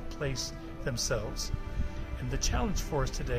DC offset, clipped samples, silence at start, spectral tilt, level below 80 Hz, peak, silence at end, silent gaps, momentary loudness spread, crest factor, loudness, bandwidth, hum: under 0.1%; under 0.1%; 0 s; -4 dB/octave; -36 dBFS; -16 dBFS; 0 s; none; 7 LU; 16 dB; -34 LUFS; 15.5 kHz; none